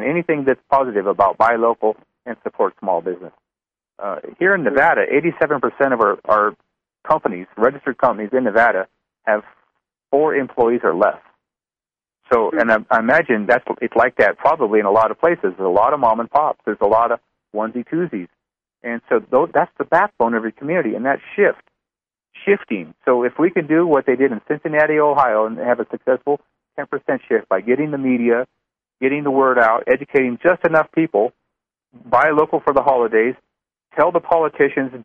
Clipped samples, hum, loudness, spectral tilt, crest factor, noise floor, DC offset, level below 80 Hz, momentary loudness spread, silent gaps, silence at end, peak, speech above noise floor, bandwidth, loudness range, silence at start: under 0.1%; none; -17 LUFS; -8.5 dB/octave; 16 dB; under -90 dBFS; under 0.1%; -58 dBFS; 10 LU; none; 0 s; -2 dBFS; over 73 dB; 6.4 kHz; 4 LU; 0 s